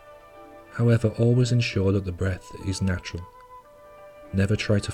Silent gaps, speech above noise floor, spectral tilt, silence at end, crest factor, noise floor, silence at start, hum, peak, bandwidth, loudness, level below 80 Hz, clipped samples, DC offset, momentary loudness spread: none; 24 dB; -6.5 dB/octave; 0 s; 16 dB; -48 dBFS; 0.05 s; none; -8 dBFS; 11 kHz; -24 LUFS; -48 dBFS; under 0.1%; under 0.1%; 14 LU